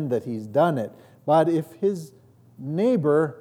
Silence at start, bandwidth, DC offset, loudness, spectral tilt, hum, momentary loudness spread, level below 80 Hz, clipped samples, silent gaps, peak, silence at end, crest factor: 0 s; 17 kHz; under 0.1%; -23 LUFS; -8 dB/octave; none; 15 LU; -76 dBFS; under 0.1%; none; -8 dBFS; 0 s; 14 dB